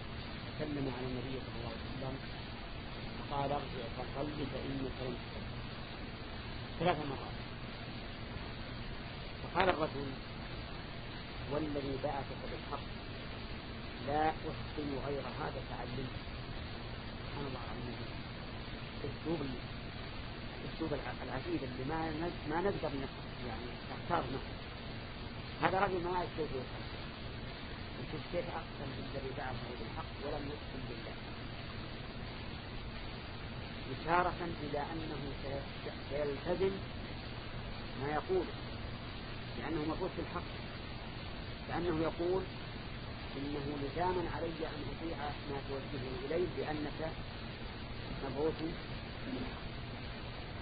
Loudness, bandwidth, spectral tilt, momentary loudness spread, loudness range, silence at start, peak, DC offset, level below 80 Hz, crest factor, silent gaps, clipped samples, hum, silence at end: -41 LUFS; 4.9 kHz; -4.5 dB/octave; 9 LU; 4 LU; 0 s; -12 dBFS; under 0.1%; -50 dBFS; 28 dB; none; under 0.1%; none; 0 s